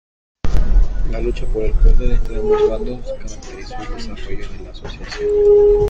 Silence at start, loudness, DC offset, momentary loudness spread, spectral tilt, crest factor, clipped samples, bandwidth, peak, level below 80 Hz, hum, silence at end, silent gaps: 0.45 s; -18 LUFS; under 0.1%; 18 LU; -7 dB/octave; 14 dB; under 0.1%; 7.4 kHz; 0 dBFS; -18 dBFS; none; 0 s; none